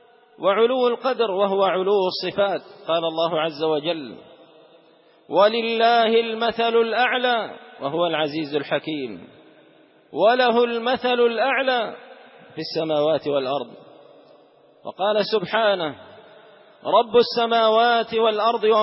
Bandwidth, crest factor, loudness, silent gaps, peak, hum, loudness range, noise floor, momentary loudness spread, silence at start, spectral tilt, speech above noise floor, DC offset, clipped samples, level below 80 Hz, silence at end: 5.8 kHz; 16 dB; -21 LUFS; none; -6 dBFS; none; 5 LU; -54 dBFS; 13 LU; 0.4 s; -8.5 dB/octave; 34 dB; under 0.1%; under 0.1%; -70 dBFS; 0 s